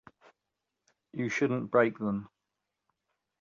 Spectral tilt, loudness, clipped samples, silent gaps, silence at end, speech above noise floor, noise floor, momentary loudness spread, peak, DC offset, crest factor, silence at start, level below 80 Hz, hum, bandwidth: -6.5 dB/octave; -30 LUFS; under 0.1%; none; 1.15 s; 57 dB; -86 dBFS; 11 LU; -12 dBFS; under 0.1%; 22 dB; 1.15 s; -72 dBFS; none; 7.6 kHz